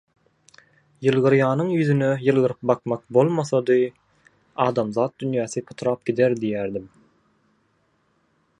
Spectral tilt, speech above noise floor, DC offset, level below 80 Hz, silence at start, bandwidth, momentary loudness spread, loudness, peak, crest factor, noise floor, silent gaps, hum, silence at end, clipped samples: -7 dB/octave; 45 dB; under 0.1%; -64 dBFS; 1 s; 10.5 kHz; 8 LU; -22 LUFS; -4 dBFS; 20 dB; -66 dBFS; none; none; 1.75 s; under 0.1%